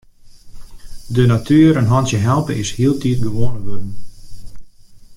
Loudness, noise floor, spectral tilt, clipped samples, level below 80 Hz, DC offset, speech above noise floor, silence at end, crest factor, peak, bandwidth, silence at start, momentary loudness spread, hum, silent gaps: -16 LUFS; -39 dBFS; -7 dB/octave; under 0.1%; -36 dBFS; under 0.1%; 26 dB; 0 s; 14 dB; 0 dBFS; 13.5 kHz; 0.25 s; 17 LU; none; none